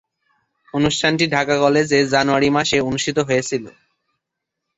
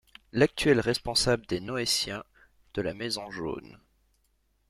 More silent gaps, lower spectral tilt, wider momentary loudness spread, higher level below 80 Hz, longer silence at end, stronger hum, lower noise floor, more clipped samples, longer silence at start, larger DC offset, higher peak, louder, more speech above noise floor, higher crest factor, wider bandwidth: neither; about the same, -4 dB/octave vs -4 dB/octave; second, 5 LU vs 12 LU; about the same, -50 dBFS vs -54 dBFS; first, 1.1 s vs 0.95 s; neither; first, -80 dBFS vs -71 dBFS; neither; first, 0.75 s vs 0.35 s; neither; first, -2 dBFS vs -8 dBFS; first, -18 LUFS vs -28 LUFS; first, 63 dB vs 42 dB; second, 16 dB vs 22 dB; second, 8.2 kHz vs 15.5 kHz